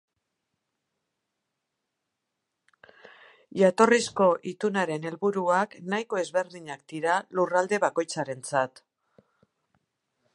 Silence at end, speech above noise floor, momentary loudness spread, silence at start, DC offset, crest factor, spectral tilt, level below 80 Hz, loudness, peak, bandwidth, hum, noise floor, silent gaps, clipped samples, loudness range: 1.65 s; 57 dB; 11 LU; 3.55 s; under 0.1%; 24 dB; -4.5 dB/octave; -78 dBFS; -26 LUFS; -4 dBFS; 11.5 kHz; none; -83 dBFS; none; under 0.1%; 4 LU